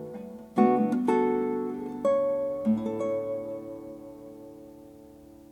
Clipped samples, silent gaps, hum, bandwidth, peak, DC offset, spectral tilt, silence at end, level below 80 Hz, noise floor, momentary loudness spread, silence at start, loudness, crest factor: under 0.1%; none; none; 12.5 kHz; -8 dBFS; under 0.1%; -8 dB/octave; 0.15 s; -64 dBFS; -50 dBFS; 21 LU; 0 s; -27 LUFS; 20 dB